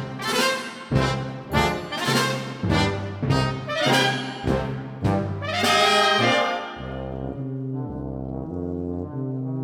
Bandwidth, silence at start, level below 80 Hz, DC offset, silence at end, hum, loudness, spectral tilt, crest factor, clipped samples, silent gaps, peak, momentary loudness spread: 18 kHz; 0 s; -42 dBFS; under 0.1%; 0 s; none; -23 LUFS; -4.5 dB/octave; 18 dB; under 0.1%; none; -6 dBFS; 13 LU